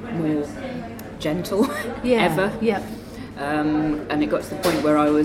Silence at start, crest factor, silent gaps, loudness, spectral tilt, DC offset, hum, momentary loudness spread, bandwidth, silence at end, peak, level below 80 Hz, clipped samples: 0 s; 16 dB; none; -23 LUFS; -6 dB/octave; under 0.1%; none; 13 LU; 16.5 kHz; 0 s; -6 dBFS; -46 dBFS; under 0.1%